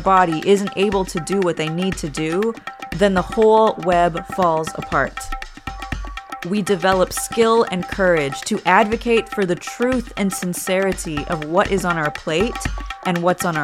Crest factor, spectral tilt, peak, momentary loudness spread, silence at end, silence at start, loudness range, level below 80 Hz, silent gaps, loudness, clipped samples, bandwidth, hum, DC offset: 18 dB; -5 dB/octave; 0 dBFS; 12 LU; 0 s; 0 s; 3 LU; -36 dBFS; none; -19 LUFS; under 0.1%; 16.5 kHz; none; under 0.1%